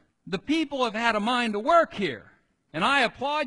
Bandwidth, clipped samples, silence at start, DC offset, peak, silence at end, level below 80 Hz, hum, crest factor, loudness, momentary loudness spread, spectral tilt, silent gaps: 11 kHz; under 0.1%; 0.25 s; under 0.1%; -8 dBFS; 0 s; -60 dBFS; none; 18 dB; -25 LUFS; 13 LU; -4.5 dB/octave; none